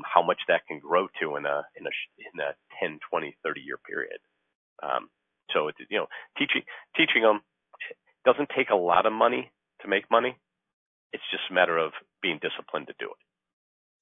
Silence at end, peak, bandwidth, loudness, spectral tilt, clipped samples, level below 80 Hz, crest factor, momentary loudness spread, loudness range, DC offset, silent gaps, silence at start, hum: 0.9 s; -2 dBFS; 3.9 kHz; -27 LUFS; -6.5 dB/octave; under 0.1%; -76 dBFS; 26 dB; 16 LU; 8 LU; under 0.1%; 4.55-4.76 s, 10.73-11.10 s; 0 s; none